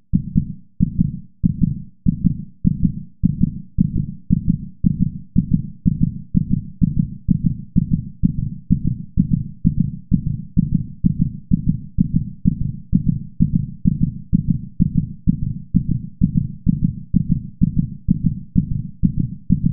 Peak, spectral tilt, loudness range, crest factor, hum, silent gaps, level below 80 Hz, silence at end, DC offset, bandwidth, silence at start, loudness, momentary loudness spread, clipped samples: -2 dBFS; -21 dB/octave; 1 LU; 18 dB; none; none; -28 dBFS; 0 s; 2%; 0.6 kHz; 0 s; -21 LUFS; 3 LU; under 0.1%